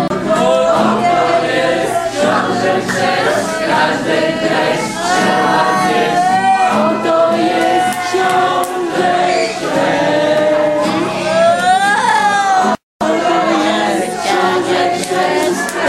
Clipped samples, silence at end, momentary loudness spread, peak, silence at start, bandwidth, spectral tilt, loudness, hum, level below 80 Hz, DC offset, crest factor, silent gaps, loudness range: under 0.1%; 0 s; 4 LU; 0 dBFS; 0 s; 15.5 kHz; -4 dB/octave; -13 LUFS; none; -50 dBFS; under 0.1%; 12 dB; 12.83-12.99 s; 1 LU